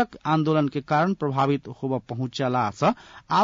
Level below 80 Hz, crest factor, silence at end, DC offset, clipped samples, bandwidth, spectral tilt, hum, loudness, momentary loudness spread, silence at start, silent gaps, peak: -60 dBFS; 14 dB; 0 s; under 0.1%; under 0.1%; 7.6 kHz; -7 dB/octave; none; -24 LUFS; 7 LU; 0 s; none; -10 dBFS